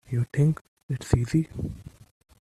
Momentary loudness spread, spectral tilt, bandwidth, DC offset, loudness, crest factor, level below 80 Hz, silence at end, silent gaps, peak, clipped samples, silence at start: 12 LU; -7.5 dB/octave; 12.5 kHz; under 0.1%; -27 LUFS; 22 dB; -44 dBFS; 0.6 s; 0.61-0.77 s, 0.83-0.89 s; -6 dBFS; under 0.1%; 0.1 s